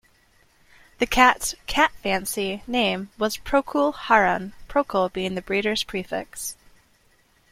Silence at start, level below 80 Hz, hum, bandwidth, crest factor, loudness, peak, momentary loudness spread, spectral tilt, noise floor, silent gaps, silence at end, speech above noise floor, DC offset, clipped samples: 1 s; -46 dBFS; none; 16.5 kHz; 24 dB; -23 LUFS; -2 dBFS; 12 LU; -3 dB/octave; -61 dBFS; none; 1 s; 38 dB; under 0.1%; under 0.1%